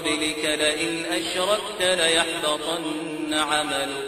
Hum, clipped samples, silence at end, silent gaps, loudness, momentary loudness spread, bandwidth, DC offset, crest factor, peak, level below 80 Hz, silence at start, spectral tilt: none; under 0.1%; 0 s; none; -23 LUFS; 7 LU; 16.5 kHz; under 0.1%; 20 dB; -4 dBFS; -56 dBFS; 0 s; -1.5 dB/octave